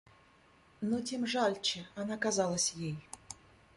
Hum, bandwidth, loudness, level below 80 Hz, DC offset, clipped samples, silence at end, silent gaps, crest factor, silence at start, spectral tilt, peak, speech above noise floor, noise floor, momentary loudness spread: none; 11.5 kHz; -34 LUFS; -68 dBFS; under 0.1%; under 0.1%; 0.4 s; none; 18 dB; 0.8 s; -3 dB/octave; -18 dBFS; 30 dB; -64 dBFS; 17 LU